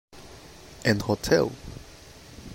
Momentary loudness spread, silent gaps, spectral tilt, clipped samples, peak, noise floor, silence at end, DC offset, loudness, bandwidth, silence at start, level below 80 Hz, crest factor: 23 LU; none; -5 dB/octave; under 0.1%; -8 dBFS; -48 dBFS; 0 s; under 0.1%; -25 LUFS; 16 kHz; 0.15 s; -48 dBFS; 22 dB